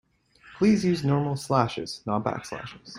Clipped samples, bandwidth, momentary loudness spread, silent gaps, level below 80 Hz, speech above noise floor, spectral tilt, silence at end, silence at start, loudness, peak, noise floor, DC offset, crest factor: under 0.1%; 15 kHz; 12 LU; none; -58 dBFS; 30 dB; -6.5 dB/octave; 0 s; 0.45 s; -26 LUFS; -6 dBFS; -55 dBFS; under 0.1%; 20 dB